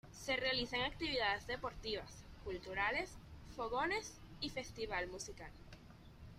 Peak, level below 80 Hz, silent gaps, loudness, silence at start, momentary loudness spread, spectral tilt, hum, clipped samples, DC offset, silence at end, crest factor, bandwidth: -24 dBFS; -58 dBFS; none; -41 LUFS; 0.05 s; 19 LU; -3 dB/octave; none; under 0.1%; under 0.1%; 0 s; 18 dB; 15.5 kHz